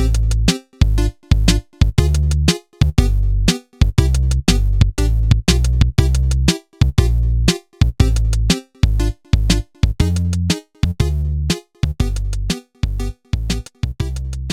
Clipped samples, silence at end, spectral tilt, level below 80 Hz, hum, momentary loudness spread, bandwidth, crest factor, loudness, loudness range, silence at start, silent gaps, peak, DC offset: under 0.1%; 0 s; -5.5 dB/octave; -18 dBFS; none; 8 LU; 16 kHz; 16 dB; -18 LUFS; 5 LU; 0 s; none; 0 dBFS; under 0.1%